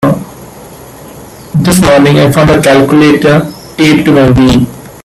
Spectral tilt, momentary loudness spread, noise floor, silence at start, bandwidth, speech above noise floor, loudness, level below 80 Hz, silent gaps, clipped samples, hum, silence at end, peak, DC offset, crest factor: -6 dB/octave; 11 LU; -29 dBFS; 0 s; 15.5 kHz; 24 dB; -6 LUFS; -30 dBFS; none; 0.2%; none; 0.15 s; 0 dBFS; under 0.1%; 8 dB